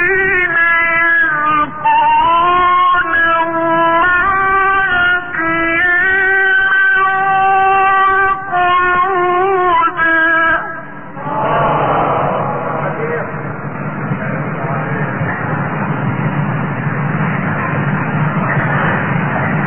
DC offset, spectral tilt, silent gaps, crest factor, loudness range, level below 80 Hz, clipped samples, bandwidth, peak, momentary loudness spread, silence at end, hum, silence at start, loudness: 2%; -9.5 dB/octave; none; 10 dB; 7 LU; -42 dBFS; under 0.1%; 3.7 kHz; -2 dBFS; 9 LU; 0 s; none; 0 s; -13 LUFS